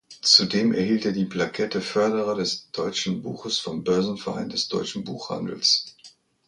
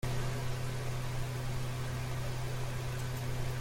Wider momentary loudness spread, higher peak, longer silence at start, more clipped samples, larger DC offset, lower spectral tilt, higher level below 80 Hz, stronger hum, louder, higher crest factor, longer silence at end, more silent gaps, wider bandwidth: first, 14 LU vs 1 LU; first, -2 dBFS vs -22 dBFS; about the same, 0.1 s vs 0.05 s; neither; neither; second, -3.5 dB/octave vs -5.5 dB/octave; second, -62 dBFS vs -44 dBFS; neither; first, -23 LUFS vs -38 LUFS; first, 24 dB vs 14 dB; first, 0.4 s vs 0 s; neither; second, 11 kHz vs 16.5 kHz